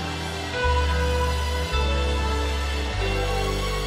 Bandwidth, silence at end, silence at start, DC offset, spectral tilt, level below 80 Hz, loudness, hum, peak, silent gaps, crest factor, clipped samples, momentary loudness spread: 15.5 kHz; 0 s; 0 s; under 0.1%; -4.5 dB/octave; -26 dBFS; -25 LUFS; none; -10 dBFS; none; 14 dB; under 0.1%; 4 LU